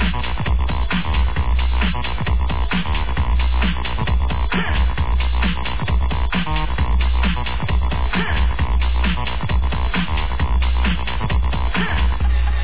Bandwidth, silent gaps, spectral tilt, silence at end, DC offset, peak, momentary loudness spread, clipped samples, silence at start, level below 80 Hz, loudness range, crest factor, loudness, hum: 4 kHz; none; -9.5 dB/octave; 0 s; 6%; -6 dBFS; 2 LU; under 0.1%; 0 s; -20 dBFS; 0 LU; 10 dB; -21 LUFS; none